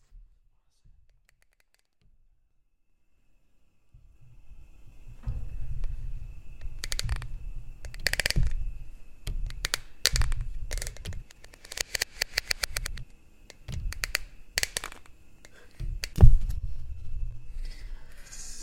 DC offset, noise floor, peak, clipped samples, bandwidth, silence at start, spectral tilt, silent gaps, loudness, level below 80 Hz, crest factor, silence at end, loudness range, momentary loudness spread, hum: under 0.1%; -68 dBFS; 0 dBFS; under 0.1%; 16.5 kHz; 0.15 s; -3 dB/octave; none; -31 LUFS; -32 dBFS; 28 dB; 0 s; 14 LU; 20 LU; none